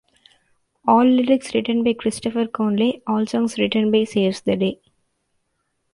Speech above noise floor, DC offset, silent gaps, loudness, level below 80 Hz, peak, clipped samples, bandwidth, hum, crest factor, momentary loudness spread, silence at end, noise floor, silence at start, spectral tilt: 53 dB; under 0.1%; none; -20 LUFS; -60 dBFS; -2 dBFS; under 0.1%; 11.5 kHz; none; 18 dB; 8 LU; 1.2 s; -72 dBFS; 0.85 s; -5.5 dB/octave